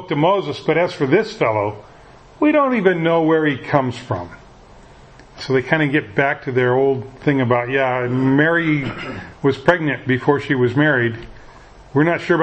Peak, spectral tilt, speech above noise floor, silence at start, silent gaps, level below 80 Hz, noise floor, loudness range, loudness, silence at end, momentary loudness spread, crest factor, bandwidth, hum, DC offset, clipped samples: 0 dBFS; -7.5 dB/octave; 26 dB; 0 s; none; -50 dBFS; -44 dBFS; 3 LU; -18 LUFS; 0 s; 9 LU; 18 dB; 8.6 kHz; none; under 0.1%; under 0.1%